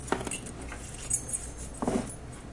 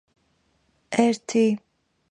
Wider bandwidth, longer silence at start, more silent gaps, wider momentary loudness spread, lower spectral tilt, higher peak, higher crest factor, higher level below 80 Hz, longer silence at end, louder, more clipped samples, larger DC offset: about the same, 11.5 kHz vs 10.5 kHz; second, 0 s vs 0.9 s; neither; first, 11 LU vs 6 LU; second, -3.5 dB/octave vs -5 dB/octave; second, -12 dBFS vs -6 dBFS; about the same, 24 dB vs 20 dB; first, -46 dBFS vs -72 dBFS; second, 0 s vs 0.55 s; second, -34 LUFS vs -23 LUFS; neither; neither